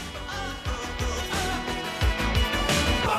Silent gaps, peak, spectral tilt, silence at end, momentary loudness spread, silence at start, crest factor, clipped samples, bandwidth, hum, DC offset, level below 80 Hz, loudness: none; -12 dBFS; -4 dB/octave; 0 s; 9 LU; 0 s; 14 dB; under 0.1%; 15.5 kHz; none; under 0.1%; -32 dBFS; -27 LUFS